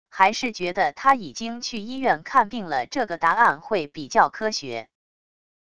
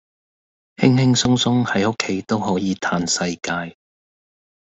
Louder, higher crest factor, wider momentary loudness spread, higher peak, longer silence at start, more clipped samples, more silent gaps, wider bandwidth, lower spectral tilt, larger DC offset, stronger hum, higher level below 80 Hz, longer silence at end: second, -23 LUFS vs -19 LUFS; about the same, 20 dB vs 20 dB; about the same, 10 LU vs 9 LU; about the same, -2 dBFS vs -2 dBFS; second, 0.1 s vs 0.8 s; neither; neither; first, 11 kHz vs 8.2 kHz; about the same, -3.5 dB/octave vs -4.5 dB/octave; first, 0.4% vs under 0.1%; neither; second, -60 dBFS vs -54 dBFS; second, 0.75 s vs 1.05 s